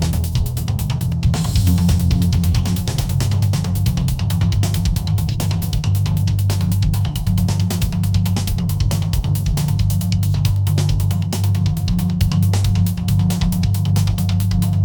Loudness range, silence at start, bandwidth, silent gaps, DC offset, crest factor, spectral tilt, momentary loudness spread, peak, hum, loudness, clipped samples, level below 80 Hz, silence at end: 1 LU; 0 s; 19.5 kHz; none; under 0.1%; 12 dB; -6 dB/octave; 3 LU; -4 dBFS; none; -18 LUFS; under 0.1%; -26 dBFS; 0 s